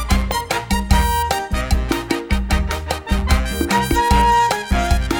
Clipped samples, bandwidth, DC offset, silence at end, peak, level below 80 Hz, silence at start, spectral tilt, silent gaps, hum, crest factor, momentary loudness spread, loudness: under 0.1%; over 20 kHz; under 0.1%; 0 s; -2 dBFS; -20 dBFS; 0 s; -4.5 dB/octave; none; none; 16 dB; 7 LU; -18 LUFS